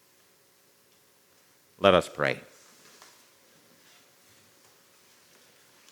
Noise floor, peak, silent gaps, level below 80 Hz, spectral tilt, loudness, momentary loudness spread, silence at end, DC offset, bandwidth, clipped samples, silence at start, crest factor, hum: -63 dBFS; -2 dBFS; none; -70 dBFS; -5 dB/octave; -25 LUFS; 30 LU; 3.55 s; under 0.1%; over 20 kHz; under 0.1%; 1.8 s; 32 dB; none